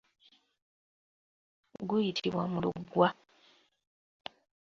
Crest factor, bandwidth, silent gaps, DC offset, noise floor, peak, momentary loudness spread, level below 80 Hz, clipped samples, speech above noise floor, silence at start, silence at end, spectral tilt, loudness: 26 dB; 7.4 kHz; none; under 0.1%; -66 dBFS; -10 dBFS; 20 LU; -70 dBFS; under 0.1%; 35 dB; 1.8 s; 1.6 s; -6.5 dB/octave; -32 LUFS